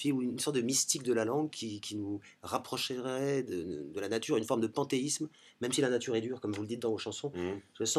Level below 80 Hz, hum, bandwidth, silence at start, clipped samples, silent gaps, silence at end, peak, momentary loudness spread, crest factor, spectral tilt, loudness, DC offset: -74 dBFS; none; 14.5 kHz; 0 s; under 0.1%; none; 0 s; -14 dBFS; 9 LU; 20 dB; -3.5 dB/octave; -34 LUFS; under 0.1%